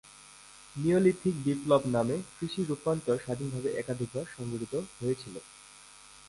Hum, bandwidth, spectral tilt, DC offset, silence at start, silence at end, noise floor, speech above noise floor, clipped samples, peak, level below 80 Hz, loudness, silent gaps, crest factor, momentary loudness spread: none; 11.5 kHz; -6.5 dB/octave; under 0.1%; 0.05 s; 0 s; -53 dBFS; 23 dB; under 0.1%; -12 dBFS; -62 dBFS; -31 LUFS; none; 20 dB; 24 LU